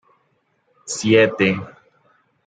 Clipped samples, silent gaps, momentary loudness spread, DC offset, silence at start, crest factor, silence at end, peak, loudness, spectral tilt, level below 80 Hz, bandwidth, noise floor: under 0.1%; none; 24 LU; under 0.1%; 0.85 s; 20 dB; 0.75 s; -2 dBFS; -18 LUFS; -4.5 dB/octave; -64 dBFS; 9.6 kHz; -66 dBFS